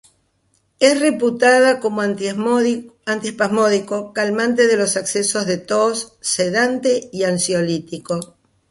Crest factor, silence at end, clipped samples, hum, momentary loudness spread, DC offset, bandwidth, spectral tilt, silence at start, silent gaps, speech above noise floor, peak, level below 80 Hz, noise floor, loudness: 18 dB; 0.45 s; under 0.1%; none; 10 LU; under 0.1%; 11.5 kHz; -3.5 dB/octave; 0.8 s; none; 46 dB; -2 dBFS; -62 dBFS; -64 dBFS; -18 LUFS